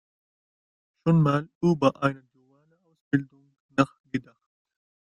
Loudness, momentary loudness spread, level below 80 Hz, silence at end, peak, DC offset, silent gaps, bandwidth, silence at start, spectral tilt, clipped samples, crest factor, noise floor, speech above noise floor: -26 LUFS; 13 LU; -66 dBFS; 1 s; -6 dBFS; under 0.1%; 1.55-1.61 s, 3.01-3.11 s, 3.60-3.69 s, 4.00-4.04 s; 9.6 kHz; 1.05 s; -8 dB/octave; under 0.1%; 22 dB; -65 dBFS; 42 dB